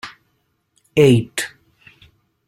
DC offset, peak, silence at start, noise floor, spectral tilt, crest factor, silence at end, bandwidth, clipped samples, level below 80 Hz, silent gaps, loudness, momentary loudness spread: under 0.1%; -2 dBFS; 0.05 s; -67 dBFS; -6 dB/octave; 18 dB; 1 s; 16.5 kHz; under 0.1%; -54 dBFS; none; -17 LUFS; 17 LU